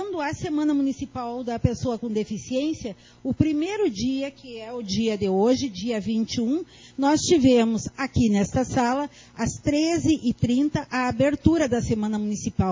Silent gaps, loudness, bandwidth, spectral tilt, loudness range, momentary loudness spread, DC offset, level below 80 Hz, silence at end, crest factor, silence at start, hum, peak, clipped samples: none; -24 LUFS; 7.6 kHz; -5.5 dB/octave; 4 LU; 10 LU; under 0.1%; -44 dBFS; 0 s; 22 dB; 0 s; none; -2 dBFS; under 0.1%